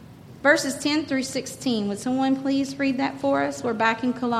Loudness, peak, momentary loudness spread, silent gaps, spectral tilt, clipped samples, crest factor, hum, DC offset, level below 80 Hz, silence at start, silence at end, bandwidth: -24 LUFS; -6 dBFS; 6 LU; none; -4 dB/octave; under 0.1%; 18 dB; none; under 0.1%; -60 dBFS; 0 s; 0 s; 14.5 kHz